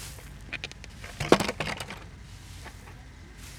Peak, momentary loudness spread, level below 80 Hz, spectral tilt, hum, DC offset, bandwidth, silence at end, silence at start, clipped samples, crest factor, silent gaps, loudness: -2 dBFS; 22 LU; -48 dBFS; -4.5 dB/octave; none; under 0.1%; 18.5 kHz; 0 s; 0 s; under 0.1%; 32 dB; none; -30 LUFS